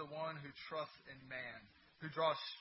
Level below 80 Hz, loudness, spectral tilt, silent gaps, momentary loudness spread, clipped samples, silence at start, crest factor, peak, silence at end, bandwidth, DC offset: -80 dBFS; -44 LUFS; -2 dB/octave; none; 14 LU; under 0.1%; 0 s; 22 dB; -22 dBFS; 0 s; 5.6 kHz; under 0.1%